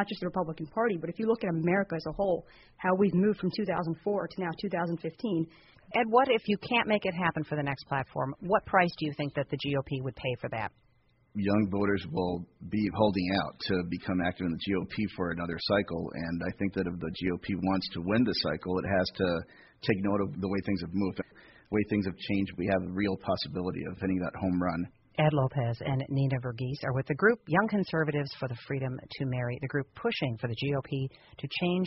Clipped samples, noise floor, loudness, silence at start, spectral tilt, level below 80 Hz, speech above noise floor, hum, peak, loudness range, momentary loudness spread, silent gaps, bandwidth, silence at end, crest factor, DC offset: under 0.1%; -66 dBFS; -31 LUFS; 0 s; -5 dB/octave; -58 dBFS; 36 dB; none; -10 dBFS; 3 LU; 8 LU; none; 5.8 kHz; 0 s; 20 dB; under 0.1%